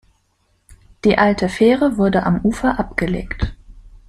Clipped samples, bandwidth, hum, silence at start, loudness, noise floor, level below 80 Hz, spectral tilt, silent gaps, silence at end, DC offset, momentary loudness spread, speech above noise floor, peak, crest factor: under 0.1%; 12 kHz; none; 1.05 s; -17 LUFS; -63 dBFS; -34 dBFS; -7 dB/octave; none; 0.15 s; under 0.1%; 10 LU; 47 dB; 0 dBFS; 18 dB